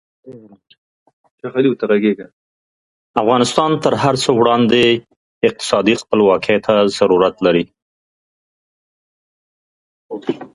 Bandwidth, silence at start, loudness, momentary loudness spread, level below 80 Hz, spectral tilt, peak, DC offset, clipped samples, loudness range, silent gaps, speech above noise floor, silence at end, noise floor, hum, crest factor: 11.5 kHz; 0.25 s; -15 LUFS; 11 LU; -54 dBFS; -5 dB/octave; 0 dBFS; under 0.1%; under 0.1%; 6 LU; 0.78-1.06 s, 1.13-1.24 s, 1.31-1.38 s, 2.33-3.14 s, 5.16-5.41 s, 7.82-10.09 s; over 75 dB; 0.1 s; under -90 dBFS; none; 16 dB